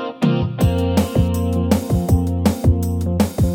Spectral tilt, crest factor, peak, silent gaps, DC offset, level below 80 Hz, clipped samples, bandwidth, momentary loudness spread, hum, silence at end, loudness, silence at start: -7.5 dB/octave; 14 dB; -4 dBFS; none; under 0.1%; -28 dBFS; under 0.1%; 17 kHz; 2 LU; none; 0 s; -18 LUFS; 0 s